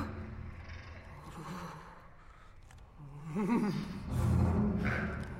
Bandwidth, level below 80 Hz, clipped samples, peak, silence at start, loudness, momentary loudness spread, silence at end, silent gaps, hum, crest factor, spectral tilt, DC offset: 15 kHz; -46 dBFS; under 0.1%; -18 dBFS; 0 s; -35 LUFS; 22 LU; 0 s; none; none; 18 dB; -7.5 dB/octave; under 0.1%